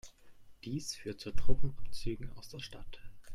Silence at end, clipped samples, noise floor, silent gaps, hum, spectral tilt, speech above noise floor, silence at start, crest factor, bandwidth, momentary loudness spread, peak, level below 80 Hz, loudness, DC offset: 0 s; under 0.1%; -54 dBFS; none; none; -5 dB/octave; 26 dB; 0.05 s; 18 dB; 12.5 kHz; 14 LU; -12 dBFS; -44 dBFS; -43 LUFS; under 0.1%